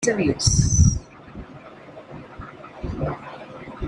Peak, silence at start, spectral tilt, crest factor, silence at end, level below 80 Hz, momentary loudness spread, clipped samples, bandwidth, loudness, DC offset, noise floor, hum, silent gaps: -4 dBFS; 0 s; -4.5 dB/octave; 20 dB; 0 s; -32 dBFS; 24 LU; under 0.1%; 11.5 kHz; -21 LUFS; under 0.1%; -42 dBFS; none; none